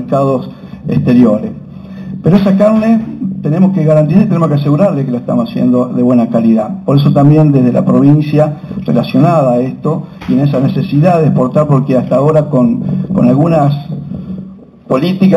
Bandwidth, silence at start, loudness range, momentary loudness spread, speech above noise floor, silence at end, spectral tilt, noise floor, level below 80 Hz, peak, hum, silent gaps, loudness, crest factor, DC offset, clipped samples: 7.8 kHz; 0 s; 2 LU; 11 LU; 22 dB; 0 s; -10 dB/octave; -31 dBFS; -42 dBFS; 0 dBFS; none; none; -10 LUFS; 10 dB; under 0.1%; 0.1%